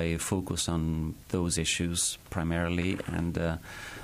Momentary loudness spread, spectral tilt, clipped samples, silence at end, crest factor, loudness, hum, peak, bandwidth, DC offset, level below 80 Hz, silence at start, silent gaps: 6 LU; -4 dB/octave; under 0.1%; 0 s; 16 dB; -30 LUFS; none; -16 dBFS; 15.5 kHz; under 0.1%; -44 dBFS; 0 s; none